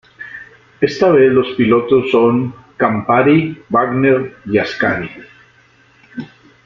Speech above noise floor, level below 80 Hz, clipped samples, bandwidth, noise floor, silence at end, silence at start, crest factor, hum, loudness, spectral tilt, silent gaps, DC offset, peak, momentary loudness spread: 37 dB; -52 dBFS; under 0.1%; 7 kHz; -50 dBFS; 0.4 s; 0.2 s; 14 dB; none; -14 LUFS; -7.5 dB/octave; none; under 0.1%; 0 dBFS; 20 LU